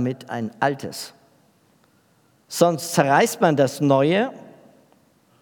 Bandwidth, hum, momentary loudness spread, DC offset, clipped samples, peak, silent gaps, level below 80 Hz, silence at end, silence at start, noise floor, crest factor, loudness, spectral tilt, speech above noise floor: 19.5 kHz; none; 14 LU; under 0.1%; under 0.1%; -2 dBFS; none; -78 dBFS; 0.9 s; 0 s; -60 dBFS; 22 dB; -21 LUFS; -5 dB/octave; 40 dB